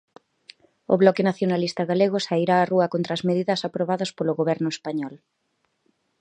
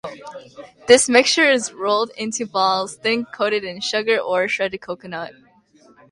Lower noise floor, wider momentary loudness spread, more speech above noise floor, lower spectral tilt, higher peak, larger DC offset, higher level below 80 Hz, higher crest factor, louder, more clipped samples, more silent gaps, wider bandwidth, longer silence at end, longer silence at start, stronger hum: first, -71 dBFS vs -53 dBFS; second, 8 LU vs 20 LU; first, 49 dB vs 34 dB; first, -6 dB/octave vs -2 dB/octave; about the same, -2 dBFS vs 0 dBFS; neither; second, -72 dBFS vs -62 dBFS; about the same, 22 dB vs 20 dB; second, -23 LUFS vs -18 LUFS; neither; neither; second, 9.4 kHz vs 11.5 kHz; first, 1.05 s vs 0.8 s; first, 0.9 s vs 0.05 s; neither